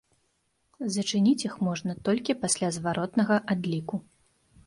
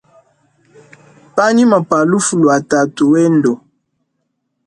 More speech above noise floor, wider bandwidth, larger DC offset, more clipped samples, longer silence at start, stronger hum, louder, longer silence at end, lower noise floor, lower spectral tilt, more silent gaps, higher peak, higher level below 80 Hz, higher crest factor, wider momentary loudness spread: second, 46 dB vs 58 dB; about the same, 11.5 kHz vs 11 kHz; neither; neither; second, 0.8 s vs 1.35 s; neither; second, -28 LUFS vs -12 LUFS; second, 0.65 s vs 1.1 s; first, -73 dBFS vs -69 dBFS; about the same, -4.5 dB/octave vs -5.5 dB/octave; neither; second, -10 dBFS vs 0 dBFS; second, -64 dBFS vs -58 dBFS; about the same, 18 dB vs 14 dB; about the same, 8 LU vs 6 LU